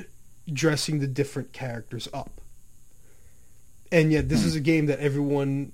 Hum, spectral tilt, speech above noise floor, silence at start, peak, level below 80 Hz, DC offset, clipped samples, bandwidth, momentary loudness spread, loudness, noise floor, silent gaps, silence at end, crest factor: none; -6 dB/octave; 30 dB; 0 s; -6 dBFS; -46 dBFS; 0.5%; under 0.1%; 16 kHz; 13 LU; -25 LUFS; -55 dBFS; none; 0.05 s; 22 dB